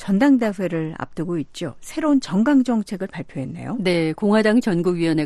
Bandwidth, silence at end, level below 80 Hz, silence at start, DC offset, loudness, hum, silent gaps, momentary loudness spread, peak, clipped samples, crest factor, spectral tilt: 12.5 kHz; 0 s; -52 dBFS; 0 s; under 0.1%; -21 LUFS; none; none; 13 LU; -6 dBFS; under 0.1%; 14 dB; -6.5 dB/octave